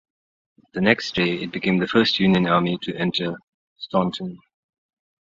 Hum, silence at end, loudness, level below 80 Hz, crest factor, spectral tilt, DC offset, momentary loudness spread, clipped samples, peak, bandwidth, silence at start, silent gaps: none; 0.85 s; -21 LUFS; -56 dBFS; 22 dB; -6.5 dB/octave; under 0.1%; 15 LU; under 0.1%; -2 dBFS; 7.6 kHz; 0.75 s; 3.43-3.76 s